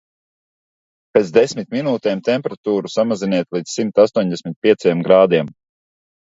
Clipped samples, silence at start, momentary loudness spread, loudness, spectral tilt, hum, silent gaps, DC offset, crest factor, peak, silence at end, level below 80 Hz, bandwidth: under 0.1%; 1.15 s; 8 LU; -17 LUFS; -6 dB/octave; none; 2.58-2.63 s, 4.56-4.62 s; under 0.1%; 18 dB; 0 dBFS; 0.9 s; -60 dBFS; 7.8 kHz